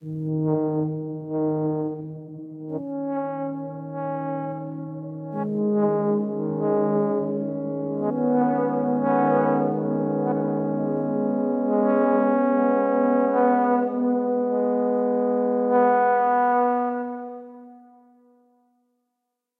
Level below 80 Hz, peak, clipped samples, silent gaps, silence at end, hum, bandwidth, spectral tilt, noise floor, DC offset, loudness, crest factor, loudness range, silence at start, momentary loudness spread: -72 dBFS; -8 dBFS; under 0.1%; none; 1.8 s; none; 3.4 kHz; -11.5 dB/octave; -81 dBFS; under 0.1%; -23 LUFS; 16 dB; 8 LU; 0 s; 13 LU